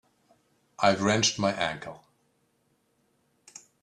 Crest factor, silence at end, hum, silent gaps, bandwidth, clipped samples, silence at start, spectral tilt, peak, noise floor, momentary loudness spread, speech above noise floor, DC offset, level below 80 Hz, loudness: 24 dB; 1.85 s; none; none; 11 kHz; under 0.1%; 0.8 s; -3.5 dB/octave; -8 dBFS; -71 dBFS; 14 LU; 45 dB; under 0.1%; -64 dBFS; -25 LUFS